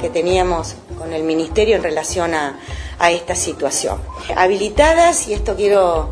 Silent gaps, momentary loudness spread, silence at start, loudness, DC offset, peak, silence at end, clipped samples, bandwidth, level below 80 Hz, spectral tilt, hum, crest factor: none; 12 LU; 0 s; -17 LUFS; under 0.1%; 0 dBFS; 0 s; under 0.1%; 11 kHz; -30 dBFS; -3.5 dB/octave; none; 16 dB